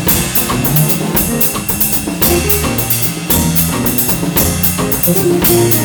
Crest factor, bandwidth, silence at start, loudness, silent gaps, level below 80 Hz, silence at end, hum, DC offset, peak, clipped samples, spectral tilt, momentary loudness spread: 12 dB; over 20 kHz; 0 s; -11 LUFS; none; -28 dBFS; 0 s; none; under 0.1%; 0 dBFS; under 0.1%; -4 dB/octave; 3 LU